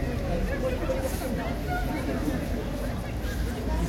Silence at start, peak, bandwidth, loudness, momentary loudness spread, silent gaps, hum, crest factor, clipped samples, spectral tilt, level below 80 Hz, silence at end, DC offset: 0 s; -16 dBFS; 16.5 kHz; -30 LUFS; 3 LU; none; none; 12 dB; under 0.1%; -6.5 dB/octave; -32 dBFS; 0 s; under 0.1%